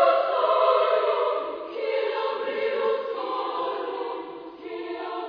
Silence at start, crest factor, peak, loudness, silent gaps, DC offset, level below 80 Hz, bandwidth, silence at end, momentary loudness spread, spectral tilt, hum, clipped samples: 0 s; 18 dB; -8 dBFS; -25 LUFS; none; under 0.1%; -76 dBFS; 5.2 kHz; 0 s; 14 LU; -5 dB/octave; none; under 0.1%